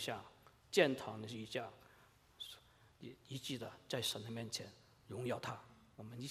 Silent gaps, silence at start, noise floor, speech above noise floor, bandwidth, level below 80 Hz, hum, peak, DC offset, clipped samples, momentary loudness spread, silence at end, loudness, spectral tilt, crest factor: none; 0 s; -68 dBFS; 25 dB; 15.5 kHz; -78 dBFS; none; -18 dBFS; under 0.1%; under 0.1%; 21 LU; 0 s; -42 LUFS; -4 dB/octave; 26 dB